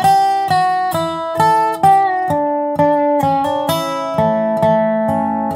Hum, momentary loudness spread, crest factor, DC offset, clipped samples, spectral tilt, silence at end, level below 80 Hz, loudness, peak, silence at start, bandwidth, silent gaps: none; 6 LU; 12 dB; under 0.1%; under 0.1%; -5.5 dB/octave; 0 s; -52 dBFS; -15 LUFS; -2 dBFS; 0 s; 16 kHz; none